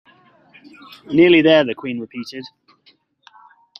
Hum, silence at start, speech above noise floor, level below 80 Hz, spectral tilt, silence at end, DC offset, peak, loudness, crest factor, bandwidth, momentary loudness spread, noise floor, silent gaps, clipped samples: none; 1.1 s; 40 dB; -62 dBFS; -6.5 dB/octave; 1.3 s; under 0.1%; -2 dBFS; -15 LUFS; 18 dB; 6.2 kHz; 20 LU; -57 dBFS; none; under 0.1%